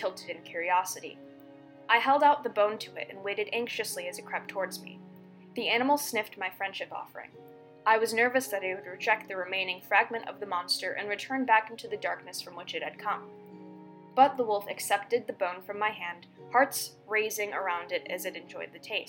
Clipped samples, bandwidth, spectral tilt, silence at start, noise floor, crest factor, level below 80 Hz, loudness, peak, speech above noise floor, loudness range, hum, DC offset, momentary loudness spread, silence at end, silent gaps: under 0.1%; 17 kHz; -2 dB/octave; 0 s; -52 dBFS; 22 dB; -88 dBFS; -30 LUFS; -8 dBFS; 21 dB; 4 LU; none; under 0.1%; 17 LU; 0 s; none